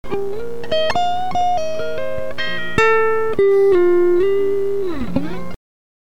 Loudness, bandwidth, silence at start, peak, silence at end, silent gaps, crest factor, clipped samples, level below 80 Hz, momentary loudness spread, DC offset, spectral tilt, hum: -18 LUFS; 11.5 kHz; 0.05 s; 0 dBFS; 0.45 s; none; 16 dB; under 0.1%; -42 dBFS; 12 LU; 9%; -5.5 dB/octave; none